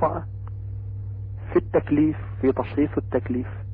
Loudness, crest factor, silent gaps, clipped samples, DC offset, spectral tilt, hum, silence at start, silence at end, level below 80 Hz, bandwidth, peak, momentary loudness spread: -26 LUFS; 16 dB; none; under 0.1%; under 0.1%; -12.5 dB/octave; none; 0 s; 0 s; -40 dBFS; 4.5 kHz; -10 dBFS; 12 LU